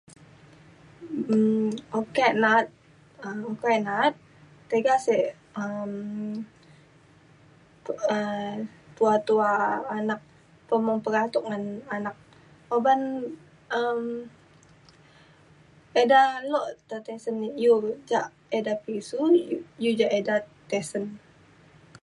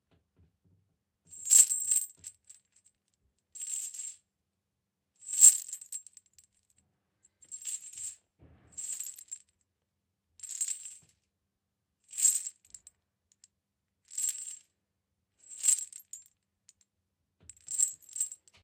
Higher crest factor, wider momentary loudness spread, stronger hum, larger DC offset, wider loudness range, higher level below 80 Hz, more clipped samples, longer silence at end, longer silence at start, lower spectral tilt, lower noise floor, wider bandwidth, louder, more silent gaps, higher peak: second, 20 dB vs 32 dB; second, 14 LU vs 27 LU; neither; neither; second, 5 LU vs 15 LU; first, -70 dBFS vs -80 dBFS; neither; first, 0.85 s vs 0.3 s; second, 1 s vs 1.3 s; first, -5.5 dB/octave vs 4 dB/octave; second, -56 dBFS vs -85 dBFS; second, 11.5 kHz vs 16.5 kHz; about the same, -26 LUFS vs -27 LUFS; neither; second, -8 dBFS vs -2 dBFS